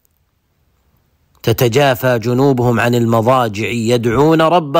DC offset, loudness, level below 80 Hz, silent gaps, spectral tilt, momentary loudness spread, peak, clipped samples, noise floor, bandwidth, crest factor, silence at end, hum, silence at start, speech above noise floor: under 0.1%; -13 LUFS; -44 dBFS; none; -6 dB/octave; 5 LU; -2 dBFS; under 0.1%; -62 dBFS; 16.5 kHz; 12 dB; 0 s; none; 1.45 s; 49 dB